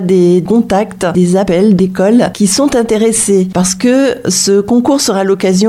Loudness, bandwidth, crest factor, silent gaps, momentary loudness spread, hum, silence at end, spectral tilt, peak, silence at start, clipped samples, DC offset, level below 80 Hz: -10 LUFS; 15.5 kHz; 10 dB; none; 3 LU; none; 0 s; -5 dB/octave; 0 dBFS; 0 s; under 0.1%; under 0.1%; -42 dBFS